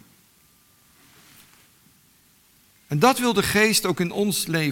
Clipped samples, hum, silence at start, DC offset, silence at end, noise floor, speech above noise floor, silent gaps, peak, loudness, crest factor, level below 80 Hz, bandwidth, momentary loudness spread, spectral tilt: under 0.1%; none; 2.9 s; under 0.1%; 0 s; -58 dBFS; 37 dB; none; -2 dBFS; -21 LUFS; 22 dB; -56 dBFS; 17.5 kHz; 6 LU; -4 dB/octave